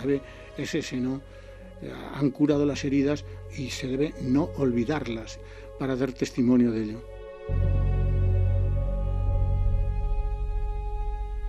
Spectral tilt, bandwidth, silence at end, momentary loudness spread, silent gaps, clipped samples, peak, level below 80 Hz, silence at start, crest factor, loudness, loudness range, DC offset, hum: -7.5 dB/octave; 8.6 kHz; 0 s; 16 LU; none; under 0.1%; -10 dBFS; -32 dBFS; 0 s; 16 dB; -28 LUFS; 2 LU; under 0.1%; none